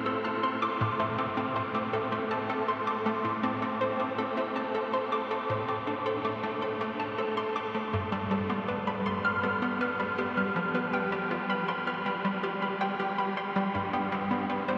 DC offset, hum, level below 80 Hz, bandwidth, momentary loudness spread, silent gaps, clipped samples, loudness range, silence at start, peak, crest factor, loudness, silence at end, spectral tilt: under 0.1%; none; -64 dBFS; 7.4 kHz; 2 LU; none; under 0.1%; 2 LU; 0 s; -14 dBFS; 16 dB; -30 LUFS; 0 s; -7.5 dB/octave